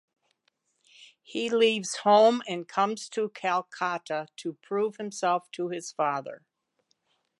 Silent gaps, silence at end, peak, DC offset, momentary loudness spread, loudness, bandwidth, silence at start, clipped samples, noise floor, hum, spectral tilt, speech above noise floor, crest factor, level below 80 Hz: none; 1.05 s; -10 dBFS; under 0.1%; 13 LU; -27 LUFS; 11.5 kHz; 1 s; under 0.1%; -75 dBFS; none; -3.5 dB/octave; 48 dB; 20 dB; -86 dBFS